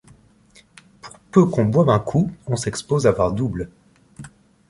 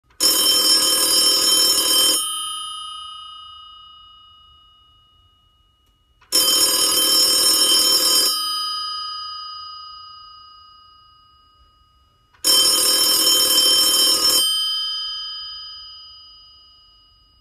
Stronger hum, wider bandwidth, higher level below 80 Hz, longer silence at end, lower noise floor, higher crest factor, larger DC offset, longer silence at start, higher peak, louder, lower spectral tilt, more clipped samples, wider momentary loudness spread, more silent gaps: neither; second, 11.5 kHz vs 15.5 kHz; first, -46 dBFS vs -58 dBFS; second, 0.4 s vs 1.25 s; second, -53 dBFS vs -60 dBFS; about the same, 20 dB vs 18 dB; neither; first, 1.05 s vs 0.2 s; about the same, -2 dBFS vs -2 dBFS; second, -20 LUFS vs -14 LUFS; first, -7 dB/octave vs 1.5 dB/octave; neither; second, 9 LU vs 20 LU; neither